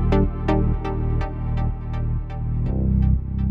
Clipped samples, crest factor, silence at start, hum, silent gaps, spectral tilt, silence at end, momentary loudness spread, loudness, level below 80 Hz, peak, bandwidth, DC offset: under 0.1%; 14 dB; 0 s; none; none; -10 dB/octave; 0 s; 6 LU; -24 LUFS; -24 dBFS; -8 dBFS; 5.6 kHz; under 0.1%